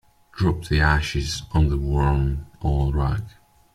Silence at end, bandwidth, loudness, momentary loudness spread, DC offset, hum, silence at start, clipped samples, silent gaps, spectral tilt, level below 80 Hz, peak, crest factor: 0.45 s; 12.5 kHz; -23 LUFS; 8 LU; under 0.1%; none; 0.35 s; under 0.1%; none; -6 dB/octave; -28 dBFS; -4 dBFS; 18 dB